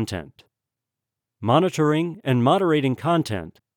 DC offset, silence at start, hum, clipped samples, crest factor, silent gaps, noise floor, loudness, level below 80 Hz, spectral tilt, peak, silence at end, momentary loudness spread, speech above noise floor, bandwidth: under 0.1%; 0 s; none; under 0.1%; 18 dB; none; -86 dBFS; -21 LUFS; -60 dBFS; -6.5 dB/octave; -6 dBFS; 0.25 s; 12 LU; 64 dB; 18 kHz